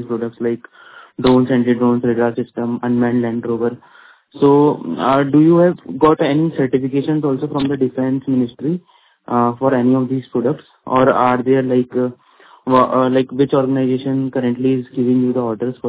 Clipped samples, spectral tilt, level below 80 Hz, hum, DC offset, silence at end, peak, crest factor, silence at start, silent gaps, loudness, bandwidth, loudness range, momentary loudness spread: under 0.1%; -12 dB/octave; -52 dBFS; none; under 0.1%; 0 s; 0 dBFS; 16 dB; 0 s; none; -16 LUFS; 4 kHz; 3 LU; 9 LU